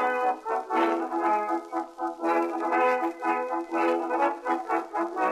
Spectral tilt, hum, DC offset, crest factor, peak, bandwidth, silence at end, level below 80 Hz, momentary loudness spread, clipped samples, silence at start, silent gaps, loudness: -4 dB/octave; none; under 0.1%; 14 dB; -12 dBFS; 13.5 kHz; 0 s; -74 dBFS; 6 LU; under 0.1%; 0 s; none; -27 LUFS